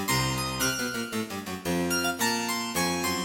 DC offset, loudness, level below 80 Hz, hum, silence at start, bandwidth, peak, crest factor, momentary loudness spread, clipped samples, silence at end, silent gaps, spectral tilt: under 0.1%; -28 LUFS; -50 dBFS; none; 0 s; 17 kHz; -14 dBFS; 16 dB; 6 LU; under 0.1%; 0 s; none; -3 dB/octave